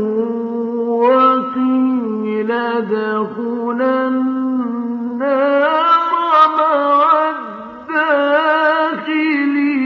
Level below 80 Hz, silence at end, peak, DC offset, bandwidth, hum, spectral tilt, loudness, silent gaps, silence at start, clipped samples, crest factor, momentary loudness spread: -70 dBFS; 0 s; 0 dBFS; under 0.1%; 6 kHz; none; -2.5 dB/octave; -15 LUFS; none; 0 s; under 0.1%; 14 dB; 9 LU